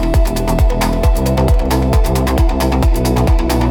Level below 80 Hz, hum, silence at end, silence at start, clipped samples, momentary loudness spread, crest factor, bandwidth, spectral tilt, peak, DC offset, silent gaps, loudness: -14 dBFS; none; 0 s; 0 s; under 0.1%; 1 LU; 10 dB; 18.5 kHz; -6.5 dB/octave; -2 dBFS; under 0.1%; none; -15 LUFS